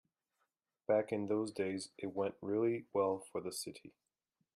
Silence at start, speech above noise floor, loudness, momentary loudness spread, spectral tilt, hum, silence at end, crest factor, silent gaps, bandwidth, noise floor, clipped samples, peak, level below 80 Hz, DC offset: 0.9 s; 48 dB; -38 LUFS; 9 LU; -5.5 dB/octave; none; 0.65 s; 18 dB; none; 15 kHz; -86 dBFS; under 0.1%; -20 dBFS; -82 dBFS; under 0.1%